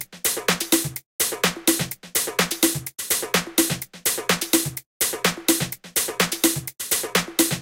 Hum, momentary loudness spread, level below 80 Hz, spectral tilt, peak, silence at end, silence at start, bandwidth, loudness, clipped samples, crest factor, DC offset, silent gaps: none; 4 LU; -54 dBFS; -2 dB/octave; -2 dBFS; 0 s; 0 s; 17 kHz; -22 LUFS; under 0.1%; 22 dB; under 0.1%; 1.06-1.19 s, 4.86-5.00 s